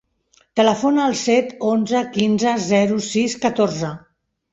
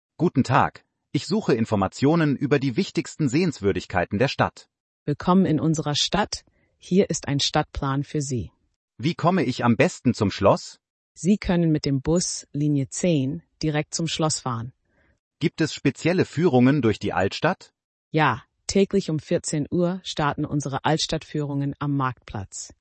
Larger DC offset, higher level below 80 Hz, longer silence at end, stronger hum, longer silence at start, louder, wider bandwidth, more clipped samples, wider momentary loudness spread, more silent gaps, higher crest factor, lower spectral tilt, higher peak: neither; second, -60 dBFS vs -50 dBFS; first, 0.55 s vs 0.15 s; neither; first, 0.55 s vs 0.2 s; first, -19 LUFS vs -23 LUFS; about the same, 8 kHz vs 8.8 kHz; neither; second, 5 LU vs 9 LU; second, none vs 4.80-5.06 s, 8.76-8.88 s, 10.90-11.15 s, 15.19-15.31 s, 17.84-18.11 s; about the same, 18 dB vs 18 dB; about the same, -5 dB/octave vs -5.5 dB/octave; first, -2 dBFS vs -6 dBFS